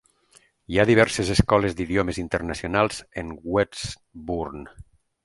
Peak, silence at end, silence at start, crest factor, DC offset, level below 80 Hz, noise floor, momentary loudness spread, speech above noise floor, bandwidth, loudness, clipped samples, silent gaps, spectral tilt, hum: 0 dBFS; 0.45 s; 0.7 s; 24 dB; under 0.1%; -40 dBFS; -59 dBFS; 15 LU; 36 dB; 11.5 kHz; -23 LUFS; under 0.1%; none; -5.5 dB/octave; none